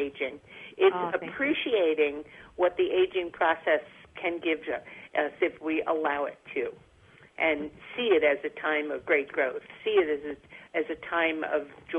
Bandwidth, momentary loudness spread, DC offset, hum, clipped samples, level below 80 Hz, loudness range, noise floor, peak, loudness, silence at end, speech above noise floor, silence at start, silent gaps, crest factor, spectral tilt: 3.8 kHz; 10 LU; under 0.1%; none; under 0.1%; -66 dBFS; 3 LU; -57 dBFS; -10 dBFS; -28 LUFS; 0 s; 28 dB; 0 s; none; 18 dB; -6 dB/octave